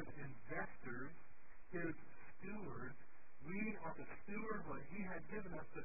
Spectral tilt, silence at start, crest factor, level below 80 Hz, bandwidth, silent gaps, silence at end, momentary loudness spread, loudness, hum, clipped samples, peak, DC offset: -3 dB/octave; 0 s; 18 dB; -68 dBFS; 2.7 kHz; none; 0 s; 15 LU; -50 LUFS; none; under 0.1%; -32 dBFS; 0.6%